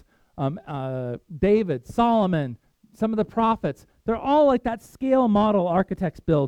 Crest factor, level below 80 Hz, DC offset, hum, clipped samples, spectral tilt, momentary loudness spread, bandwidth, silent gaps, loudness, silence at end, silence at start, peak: 14 dB; -48 dBFS; under 0.1%; none; under 0.1%; -8.5 dB/octave; 12 LU; 12 kHz; none; -23 LUFS; 0 s; 0.35 s; -8 dBFS